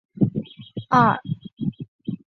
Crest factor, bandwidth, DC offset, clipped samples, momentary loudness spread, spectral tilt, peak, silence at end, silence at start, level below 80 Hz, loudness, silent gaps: 20 dB; 6.4 kHz; under 0.1%; under 0.1%; 17 LU; -8 dB/octave; -4 dBFS; 0.1 s; 0.15 s; -56 dBFS; -23 LUFS; 1.53-1.57 s, 1.88-1.99 s